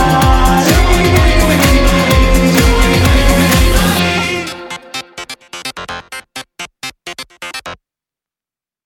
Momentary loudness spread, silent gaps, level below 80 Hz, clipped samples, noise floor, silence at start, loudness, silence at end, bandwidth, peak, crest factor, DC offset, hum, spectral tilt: 17 LU; none; -16 dBFS; under 0.1%; under -90 dBFS; 0 s; -10 LUFS; 1.1 s; 19.5 kHz; 0 dBFS; 12 dB; under 0.1%; none; -4.5 dB/octave